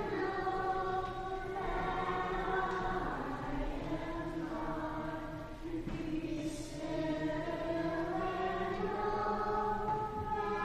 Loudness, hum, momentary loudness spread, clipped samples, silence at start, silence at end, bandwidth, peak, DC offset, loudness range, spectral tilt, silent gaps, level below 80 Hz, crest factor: -37 LUFS; none; 5 LU; under 0.1%; 0 s; 0 s; 15 kHz; -22 dBFS; under 0.1%; 4 LU; -6.5 dB/octave; none; -48 dBFS; 14 dB